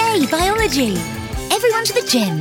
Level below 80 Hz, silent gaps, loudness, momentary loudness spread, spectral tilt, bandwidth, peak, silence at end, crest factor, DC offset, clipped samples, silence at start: -34 dBFS; none; -17 LUFS; 8 LU; -3.5 dB/octave; 17.5 kHz; -2 dBFS; 0 s; 16 dB; under 0.1%; under 0.1%; 0 s